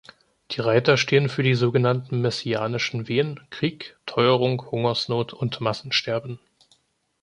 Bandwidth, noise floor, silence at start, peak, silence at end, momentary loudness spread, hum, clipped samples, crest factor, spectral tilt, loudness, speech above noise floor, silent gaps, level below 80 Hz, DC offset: 10 kHz; -66 dBFS; 0.5 s; -4 dBFS; 0.85 s; 10 LU; none; under 0.1%; 20 dB; -6 dB/octave; -23 LUFS; 43 dB; none; -62 dBFS; under 0.1%